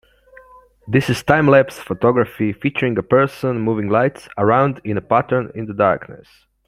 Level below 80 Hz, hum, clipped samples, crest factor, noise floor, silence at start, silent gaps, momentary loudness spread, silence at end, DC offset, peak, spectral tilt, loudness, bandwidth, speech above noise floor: -50 dBFS; none; under 0.1%; 18 dB; -47 dBFS; 0.85 s; none; 7 LU; 0.5 s; under 0.1%; 0 dBFS; -7 dB/octave; -17 LUFS; 15.5 kHz; 30 dB